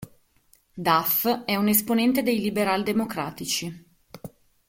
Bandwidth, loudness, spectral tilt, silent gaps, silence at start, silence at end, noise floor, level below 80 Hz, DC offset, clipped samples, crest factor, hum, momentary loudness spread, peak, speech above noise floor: 16.5 kHz; -23 LUFS; -4 dB/octave; none; 0 s; 0.4 s; -62 dBFS; -60 dBFS; under 0.1%; under 0.1%; 20 dB; none; 14 LU; -6 dBFS; 38 dB